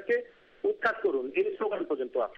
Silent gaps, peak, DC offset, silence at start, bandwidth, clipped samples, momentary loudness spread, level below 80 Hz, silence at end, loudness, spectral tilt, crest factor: none; -12 dBFS; under 0.1%; 0 s; 6 kHz; under 0.1%; 4 LU; -72 dBFS; 0.05 s; -30 LUFS; -6 dB/octave; 18 dB